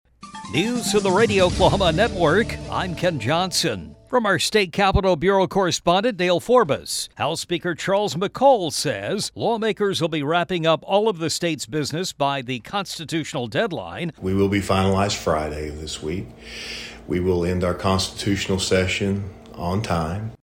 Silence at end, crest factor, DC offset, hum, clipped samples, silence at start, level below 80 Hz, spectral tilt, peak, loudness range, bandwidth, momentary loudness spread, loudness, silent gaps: 0.1 s; 18 dB; under 0.1%; none; under 0.1%; 0.2 s; -42 dBFS; -4.5 dB/octave; -4 dBFS; 5 LU; 17 kHz; 11 LU; -21 LUFS; none